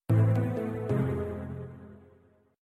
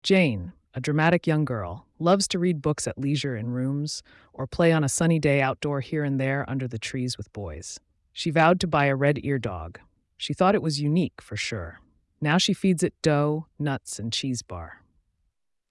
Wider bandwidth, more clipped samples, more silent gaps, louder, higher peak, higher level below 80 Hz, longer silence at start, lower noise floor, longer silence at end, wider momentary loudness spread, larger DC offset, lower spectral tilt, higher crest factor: second, 3.9 kHz vs 12 kHz; neither; neither; second, -30 LUFS vs -25 LUFS; second, -16 dBFS vs -8 dBFS; about the same, -54 dBFS vs -54 dBFS; about the same, 0.1 s vs 0.05 s; second, -62 dBFS vs -74 dBFS; second, 0.65 s vs 0.95 s; first, 18 LU vs 15 LU; neither; first, -10 dB/octave vs -5.5 dB/octave; about the same, 14 dB vs 16 dB